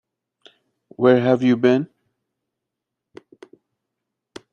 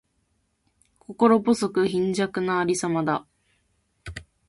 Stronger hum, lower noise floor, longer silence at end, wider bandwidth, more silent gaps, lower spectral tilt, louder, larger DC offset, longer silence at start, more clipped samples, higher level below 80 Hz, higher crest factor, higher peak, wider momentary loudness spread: neither; first, -83 dBFS vs -71 dBFS; first, 2.7 s vs 0.25 s; second, 7 kHz vs 11.5 kHz; neither; first, -8 dB/octave vs -5.5 dB/octave; first, -17 LUFS vs -23 LUFS; neither; about the same, 1 s vs 1.1 s; neither; second, -68 dBFS vs -56 dBFS; about the same, 20 dB vs 20 dB; first, -2 dBFS vs -6 dBFS; second, 6 LU vs 20 LU